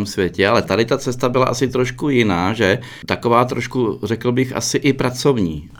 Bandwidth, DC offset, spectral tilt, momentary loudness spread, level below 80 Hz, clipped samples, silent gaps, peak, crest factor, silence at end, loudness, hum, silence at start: 19.5 kHz; under 0.1%; -5 dB/octave; 5 LU; -44 dBFS; under 0.1%; none; -2 dBFS; 16 dB; 0 s; -18 LUFS; none; 0 s